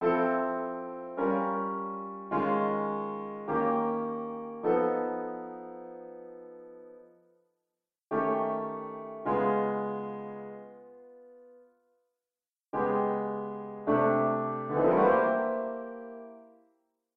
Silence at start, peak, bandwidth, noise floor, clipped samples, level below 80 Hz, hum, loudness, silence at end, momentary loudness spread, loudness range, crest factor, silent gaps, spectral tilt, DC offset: 0 s; -12 dBFS; 4.7 kHz; under -90 dBFS; under 0.1%; -70 dBFS; none; -30 LUFS; 0.7 s; 19 LU; 9 LU; 20 dB; none; -10 dB/octave; under 0.1%